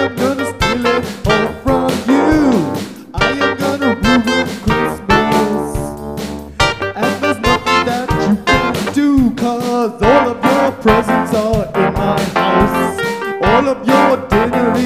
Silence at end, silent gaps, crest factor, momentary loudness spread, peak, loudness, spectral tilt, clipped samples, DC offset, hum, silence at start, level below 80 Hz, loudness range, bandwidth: 0 s; none; 14 dB; 6 LU; 0 dBFS; -14 LUFS; -5.5 dB/octave; under 0.1%; 0.3%; none; 0 s; -32 dBFS; 2 LU; 16 kHz